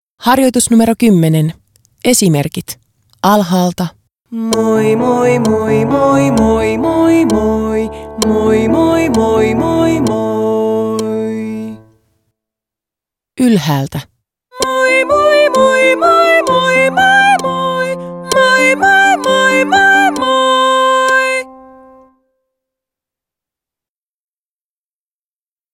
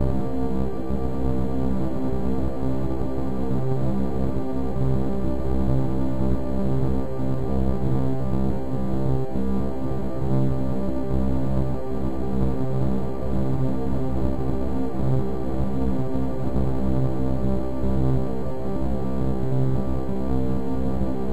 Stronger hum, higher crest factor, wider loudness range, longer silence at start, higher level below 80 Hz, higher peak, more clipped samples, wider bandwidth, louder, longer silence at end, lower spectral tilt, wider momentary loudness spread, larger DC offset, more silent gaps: neither; about the same, 12 dB vs 14 dB; first, 8 LU vs 1 LU; first, 0.2 s vs 0 s; second, -40 dBFS vs -32 dBFS; first, 0 dBFS vs -8 dBFS; neither; first, 17.5 kHz vs 11.5 kHz; first, -11 LUFS vs -26 LUFS; first, 4.2 s vs 0 s; second, -4.5 dB/octave vs -10 dB/octave; first, 11 LU vs 3 LU; second, under 0.1% vs 8%; neither